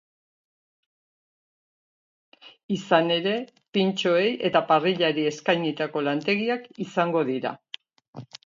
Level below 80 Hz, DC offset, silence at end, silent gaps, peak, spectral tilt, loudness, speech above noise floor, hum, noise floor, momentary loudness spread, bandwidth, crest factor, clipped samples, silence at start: -74 dBFS; under 0.1%; 0.2 s; 2.63-2.69 s, 3.68-3.72 s, 8.08-8.13 s; -6 dBFS; -5.5 dB/octave; -24 LUFS; 22 dB; none; -46 dBFS; 11 LU; 7.6 kHz; 20 dB; under 0.1%; 2.45 s